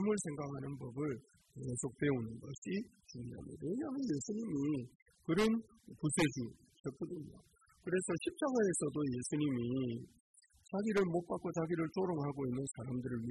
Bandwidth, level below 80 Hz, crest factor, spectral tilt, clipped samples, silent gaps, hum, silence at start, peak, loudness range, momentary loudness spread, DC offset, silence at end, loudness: 12 kHz; -66 dBFS; 20 dB; -5.5 dB/octave; under 0.1%; 2.58-2.62 s, 4.95-5.06 s, 6.80-6.84 s, 10.20-10.34 s; none; 0 s; -18 dBFS; 4 LU; 14 LU; under 0.1%; 0 s; -39 LUFS